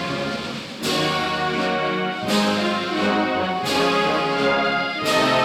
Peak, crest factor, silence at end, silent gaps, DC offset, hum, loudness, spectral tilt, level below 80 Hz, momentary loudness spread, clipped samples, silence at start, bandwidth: -10 dBFS; 12 dB; 0 s; none; under 0.1%; none; -21 LUFS; -4 dB/octave; -54 dBFS; 6 LU; under 0.1%; 0 s; 18 kHz